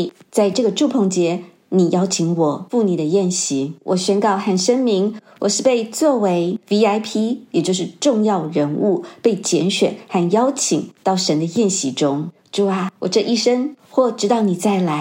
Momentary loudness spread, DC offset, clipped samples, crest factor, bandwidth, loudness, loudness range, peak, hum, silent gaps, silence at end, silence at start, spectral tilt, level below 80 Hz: 5 LU; under 0.1%; under 0.1%; 16 dB; 16.5 kHz; -18 LUFS; 1 LU; -2 dBFS; none; none; 0 s; 0 s; -5 dB/octave; -72 dBFS